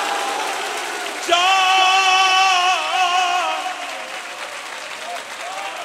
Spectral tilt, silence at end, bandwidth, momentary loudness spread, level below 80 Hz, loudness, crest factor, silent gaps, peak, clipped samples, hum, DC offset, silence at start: 1.5 dB/octave; 0 s; 16 kHz; 15 LU; -74 dBFS; -17 LUFS; 16 dB; none; -2 dBFS; under 0.1%; none; under 0.1%; 0 s